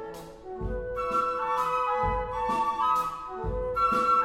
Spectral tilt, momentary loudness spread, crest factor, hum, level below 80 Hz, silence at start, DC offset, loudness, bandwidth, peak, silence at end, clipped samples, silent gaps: -5.5 dB/octave; 11 LU; 14 dB; none; -42 dBFS; 0 s; under 0.1%; -28 LUFS; 16 kHz; -14 dBFS; 0 s; under 0.1%; none